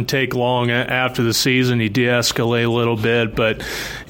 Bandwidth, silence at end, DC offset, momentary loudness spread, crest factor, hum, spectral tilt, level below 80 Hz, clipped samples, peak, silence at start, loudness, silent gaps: 17 kHz; 0 s; under 0.1%; 4 LU; 14 dB; none; -4.5 dB/octave; -44 dBFS; under 0.1%; -4 dBFS; 0 s; -18 LUFS; none